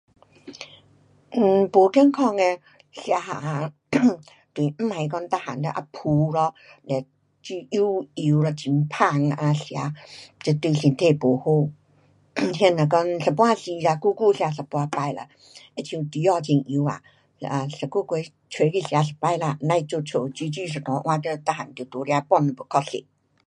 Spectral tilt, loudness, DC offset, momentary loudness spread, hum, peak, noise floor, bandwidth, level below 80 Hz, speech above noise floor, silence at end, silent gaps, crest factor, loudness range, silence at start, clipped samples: -7 dB/octave; -23 LUFS; under 0.1%; 14 LU; none; -2 dBFS; -59 dBFS; 10.5 kHz; -66 dBFS; 37 dB; 0.45 s; none; 22 dB; 4 LU; 0.45 s; under 0.1%